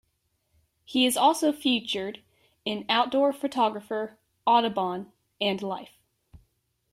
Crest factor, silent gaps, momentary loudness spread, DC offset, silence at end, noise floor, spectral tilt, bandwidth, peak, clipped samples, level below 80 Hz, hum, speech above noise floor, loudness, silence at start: 20 dB; none; 14 LU; under 0.1%; 1.05 s; -74 dBFS; -3.5 dB/octave; 16 kHz; -8 dBFS; under 0.1%; -68 dBFS; none; 49 dB; -26 LUFS; 0.9 s